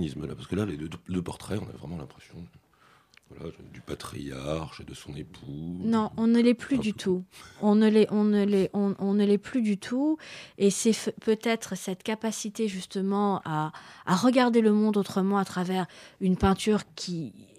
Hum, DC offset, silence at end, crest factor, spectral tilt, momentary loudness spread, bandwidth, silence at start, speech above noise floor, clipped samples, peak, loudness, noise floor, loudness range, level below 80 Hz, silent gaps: none; under 0.1%; 0.15 s; 18 dB; -6 dB/octave; 19 LU; 14 kHz; 0 s; 34 dB; under 0.1%; -10 dBFS; -27 LUFS; -61 dBFS; 14 LU; -52 dBFS; none